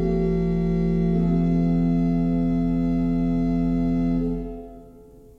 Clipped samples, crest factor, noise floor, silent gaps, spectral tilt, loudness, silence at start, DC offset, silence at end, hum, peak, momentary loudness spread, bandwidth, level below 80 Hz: under 0.1%; 10 dB; -47 dBFS; none; -10.5 dB/octave; -22 LUFS; 0 s; under 0.1%; 0.4 s; none; -12 dBFS; 5 LU; 4.3 kHz; -32 dBFS